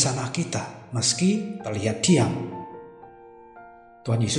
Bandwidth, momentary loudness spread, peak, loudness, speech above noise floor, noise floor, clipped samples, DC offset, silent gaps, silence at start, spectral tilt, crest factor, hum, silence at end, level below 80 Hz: 11.5 kHz; 18 LU; -6 dBFS; -24 LUFS; 23 dB; -47 dBFS; under 0.1%; under 0.1%; none; 0 s; -4.5 dB/octave; 20 dB; none; 0 s; -60 dBFS